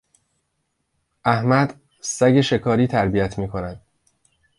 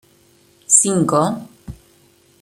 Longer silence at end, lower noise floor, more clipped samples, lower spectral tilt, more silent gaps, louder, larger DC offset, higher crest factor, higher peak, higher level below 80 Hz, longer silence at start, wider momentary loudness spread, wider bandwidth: first, 0.8 s vs 0.65 s; first, -73 dBFS vs -54 dBFS; neither; first, -6 dB/octave vs -4 dB/octave; neither; second, -20 LUFS vs -15 LUFS; neither; about the same, 20 dB vs 20 dB; about the same, -2 dBFS vs 0 dBFS; about the same, -46 dBFS vs -50 dBFS; first, 1.25 s vs 0.7 s; second, 12 LU vs 18 LU; second, 11.5 kHz vs 16 kHz